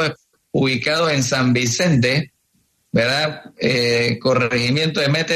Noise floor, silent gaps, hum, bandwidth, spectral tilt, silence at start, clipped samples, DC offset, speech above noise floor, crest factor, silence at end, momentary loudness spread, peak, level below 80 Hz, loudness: -64 dBFS; none; none; 13.5 kHz; -4.5 dB/octave; 0 s; under 0.1%; under 0.1%; 46 dB; 14 dB; 0 s; 7 LU; -4 dBFS; -52 dBFS; -18 LUFS